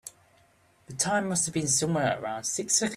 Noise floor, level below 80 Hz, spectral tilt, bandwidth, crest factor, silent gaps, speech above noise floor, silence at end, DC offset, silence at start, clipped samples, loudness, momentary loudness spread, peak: -63 dBFS; -64 dBFS; -3 dB/octave; 15.5 kHz; 18 dB; none; 35 dB; 0 s; under 0.1%; 0.05 s; under 0.1%; -27 LUFS; 6 LU; -10 dBFS